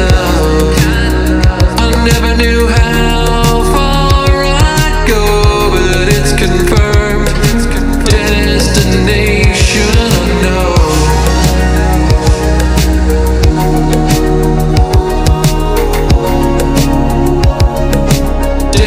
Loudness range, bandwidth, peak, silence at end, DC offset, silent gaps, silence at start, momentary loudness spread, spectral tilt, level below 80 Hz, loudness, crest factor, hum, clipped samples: 1 LU; 16.5 kHz; 0 dBFS; 0 s; under 0.1%; none; 0 s; 2 LU; -5 dB/octave; -12 dBFS; -10 LUFS; 8 dB; none; under 0.1%